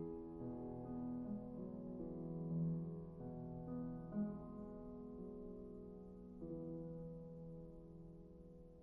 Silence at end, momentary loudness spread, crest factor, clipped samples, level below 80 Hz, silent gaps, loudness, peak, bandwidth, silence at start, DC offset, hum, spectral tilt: 0 s; 12 LU; 14 dB; under 0.1%; -64 dBFS; none; -50 LUFS; -34 dBFS; 2 kHz; 0 s; under 0.1%; none; -12 dB/octave